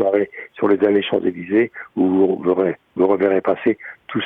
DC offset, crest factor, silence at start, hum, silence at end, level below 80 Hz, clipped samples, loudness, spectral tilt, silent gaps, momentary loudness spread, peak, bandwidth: under 0.1%; 14 dB; 0 s; none; 0 s; -66 dBFS; under 0.1%; -19 LUFS; -9 dB/octave; none; 7 LU; -4 dBFS; 3.9 kHz